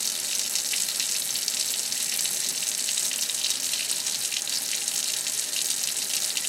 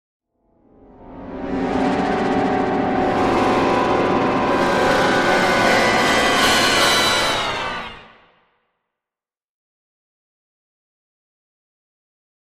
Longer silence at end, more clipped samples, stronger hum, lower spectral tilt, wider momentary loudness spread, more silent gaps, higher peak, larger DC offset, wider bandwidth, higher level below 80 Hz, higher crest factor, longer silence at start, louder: second, 0 s vs 4.4 s; neither; neither; second, 2.5 dB/octave vs -3.5 dB/octave; second, 1 LU vs 11 LU; neither; second, -6 dBFS vs -2 dBFS; neither; about the same, 17 kHz vs 15.5 kHz; second, -78 dBFS vs -44 dBFS; about the same, 22 dB vs 18 dB; second, 0 s vs 1 s; second, -24 LUFS vs -17 LUFS